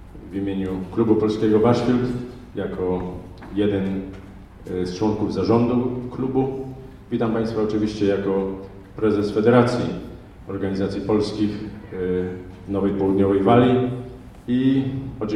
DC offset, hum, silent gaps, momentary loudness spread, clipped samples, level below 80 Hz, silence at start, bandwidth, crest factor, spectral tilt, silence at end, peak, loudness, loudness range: under 0.1%; none; none; 16 LU; under 0.1%; -44 dBFS; 0 s; 10.5 kHz; 20 dB; -8 dB/octave; 0 s; 0 dBFS; -22 LUFS; 4 LU